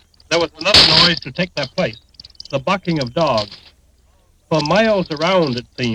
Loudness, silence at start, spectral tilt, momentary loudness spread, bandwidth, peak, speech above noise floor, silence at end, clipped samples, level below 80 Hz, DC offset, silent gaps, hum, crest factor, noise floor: -15 LUFS; 0.3 s; -4 dB/octave; 14 LU; 18 kHz; 0 dBFS; 38 dB; 0 s; under 0.1%; -42 dBFS; under 0.1%; none; none; 18 dB; -54 dBFS